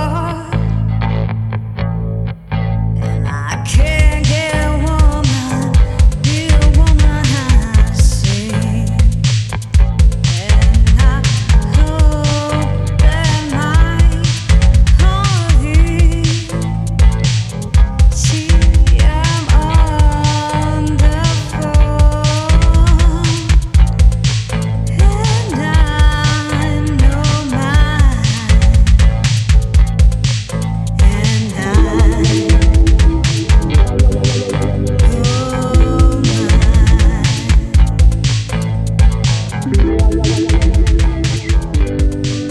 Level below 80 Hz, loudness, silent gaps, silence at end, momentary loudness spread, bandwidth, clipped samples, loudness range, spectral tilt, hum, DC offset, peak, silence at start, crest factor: -12 dBFS; -13 LUFS; none; 0 s; 6 LU; 11.5 kHz; under 0.1%; 2 LU; -5.5 dB/octave; none; under 0.1%; 0 dBFS; 0 s; 10 dB